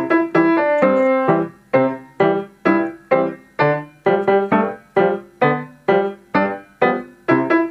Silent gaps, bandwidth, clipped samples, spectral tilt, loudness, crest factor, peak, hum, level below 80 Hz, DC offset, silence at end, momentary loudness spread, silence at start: none; 6 kHz; under 0.1%; -8.5 dB/octave; -18 LUFS; 16 dB; 0 dBFS; none; -62 dBFS; under 0.1%; 0 s; 5 LU; 0 s